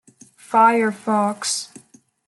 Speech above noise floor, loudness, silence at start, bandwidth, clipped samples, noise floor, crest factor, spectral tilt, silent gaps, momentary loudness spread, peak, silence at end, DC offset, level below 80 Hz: 34 dB; -19 LUFS; 0.5 s; 12 kHz; under 0.1%; -52 dBFS; 18 dB; -3.5 dB/octave; none; 10 LU; -4 dBFS; 0.6 s; under 0.1%; -74 dBFS